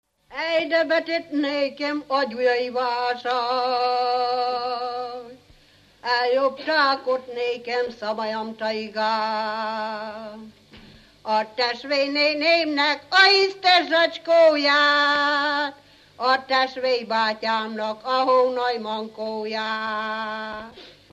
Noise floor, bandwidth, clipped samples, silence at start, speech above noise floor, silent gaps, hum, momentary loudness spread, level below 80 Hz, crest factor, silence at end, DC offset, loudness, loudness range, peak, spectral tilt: -55 dBFS; 10 kHz; under 0.1%; 0.3 s; 33 dB; none; 50 Hz at -75 dBFS; 13 LU; -66 dBFS; 20 dB; 0.2 s; under 0.1%; -22 LUFS; 9 LU; -4 dBFS; -3 dB/octave